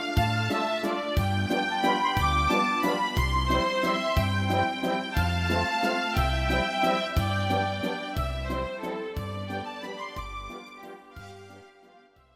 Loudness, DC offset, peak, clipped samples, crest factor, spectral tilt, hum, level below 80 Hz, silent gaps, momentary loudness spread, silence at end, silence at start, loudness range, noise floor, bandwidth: -27 LUFS; under 0.1%; -12 dBFS; under 0.1%; 16 dB; -5.5 dB/octave; none; -36 dBFS; none; 14 LU; 0.7 s; 0 s; 10 LU; -57 dBFS; 16 kHz